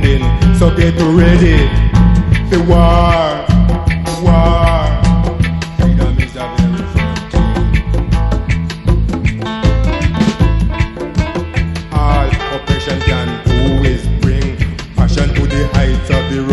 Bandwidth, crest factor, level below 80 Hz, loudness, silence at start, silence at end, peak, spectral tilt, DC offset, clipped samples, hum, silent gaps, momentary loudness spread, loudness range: 11.5 kHz; 12 dB; -16 dBFS; -13 LUFS; 0 s; 0 s; 0 dBFS; -7 dB/octave; under 0.1%; 0.3%; none; none; 7 LU; 5 LU